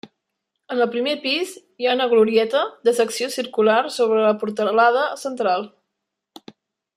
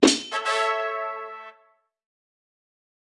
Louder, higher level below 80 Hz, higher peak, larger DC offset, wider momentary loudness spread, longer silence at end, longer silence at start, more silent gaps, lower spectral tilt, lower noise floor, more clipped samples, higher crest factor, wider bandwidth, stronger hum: first, -20 LUFS vs -25 LUFS; second, -76 dBFS vs -68 dBFS; second, -4 dBFS vs 0 dBFS; neither; second, 8 LU vs 18 LU; second, 1.3 s vs 1.55 s; about the same, 0.05 s vs 0 s; neither; first, -3.5 dB/octave vs -1.5 dB/octave; first, -80 dBFS vs -63 dBFS; neither; second, 16 dB vs 26 dB; first, 14.5 kHz vs 12 kHz; neither